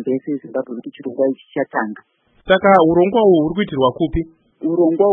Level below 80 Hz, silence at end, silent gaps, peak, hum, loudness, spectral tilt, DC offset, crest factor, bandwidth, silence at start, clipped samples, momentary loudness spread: -42 dBFS; 0 s; none; 0 dBFS; none; -17 LUFS; -9.5 dB/octave; under 0.1%; 16 dB; 3.8 kHz; 0 s; under 0.1%; 16 LU